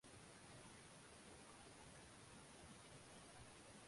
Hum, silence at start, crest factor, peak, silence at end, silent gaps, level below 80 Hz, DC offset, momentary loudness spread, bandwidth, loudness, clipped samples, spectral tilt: none; 0.05 s; 14 dB; -48 dBFS; 0 s; none; -76 dBFS; under 0.1%; 1 LU; 11.5 kHz; -61 LUFS; under 0.1%; -3 dB/octave